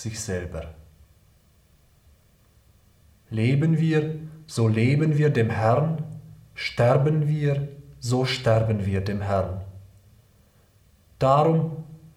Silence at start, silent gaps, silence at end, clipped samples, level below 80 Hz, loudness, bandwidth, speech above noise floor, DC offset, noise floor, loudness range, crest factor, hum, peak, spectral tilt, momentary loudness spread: 0 s; none; 0.1 s; under 0.1%; -52 dBFS; -23 LUFS; 12.5 kHz; 37 dB; under 0.1%; -59 dBFS; 6 LU; 18 dB; none; -6 dBFS; -7 dB/octave; 16 LU